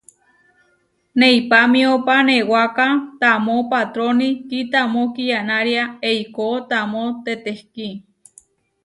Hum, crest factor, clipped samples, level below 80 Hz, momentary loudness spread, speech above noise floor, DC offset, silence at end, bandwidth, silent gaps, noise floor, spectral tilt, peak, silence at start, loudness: none; 16 dB; under 0.1%; -66 dBFS; 12 LU; 45 dB; under 0.1%; 0.85 s; 11.5 kHz; none; -63 dBFS; -4.5 dB/octave; -2 dBFS; 1.15 s; -17 LUFS